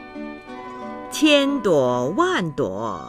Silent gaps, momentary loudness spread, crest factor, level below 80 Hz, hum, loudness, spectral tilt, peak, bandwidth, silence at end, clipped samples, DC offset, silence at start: none; 18 LU; 18 dB; -54 dBFS; none; -20 LUFS; -4.5 dB/octave; -4 dBFS; 15.5 kHz; 0 s; under 0.1%; under 0.1%; 0 s